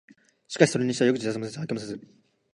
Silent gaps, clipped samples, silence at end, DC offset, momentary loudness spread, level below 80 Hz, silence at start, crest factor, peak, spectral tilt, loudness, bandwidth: none; under 0.1%; 0.5 s; under 0.1%; 16 LU; -68 dBFS; 0.5 s; 24 dB; -2 dBFS; -5 dB/octave; -25 LUFS; 11 kHz